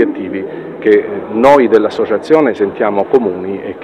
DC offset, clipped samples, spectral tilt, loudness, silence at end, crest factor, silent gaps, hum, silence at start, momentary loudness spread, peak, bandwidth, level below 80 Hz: under 0.1%; 0.5%; -7 dB/octave; -12 LUFS; 0 s; 12 dB; none; none; 0 s; 13 LU; 0 dBFS; 9.4 kHz; -52 dBFS